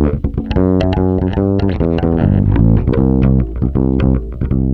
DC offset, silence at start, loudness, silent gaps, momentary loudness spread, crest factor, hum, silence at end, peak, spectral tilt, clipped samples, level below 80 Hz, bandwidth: under 0.1%; 0 s; -14 LUFS; none; 5 LU; 12 dB; none; 0 s; -2 dBFS; -10.5 dB/octave; under 0.1%; -20 dBFS; 5.8 kHz